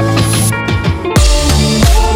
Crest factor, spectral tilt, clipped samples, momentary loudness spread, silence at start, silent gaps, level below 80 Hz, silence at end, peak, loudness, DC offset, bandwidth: 10 dB; -4.5 dB/octave; under 0.1%; 4 LU; 0 s; none; -14 dBFS; 0 s; 0 dBFS; -11 LUFS; under 0.1%; 18.5 kHz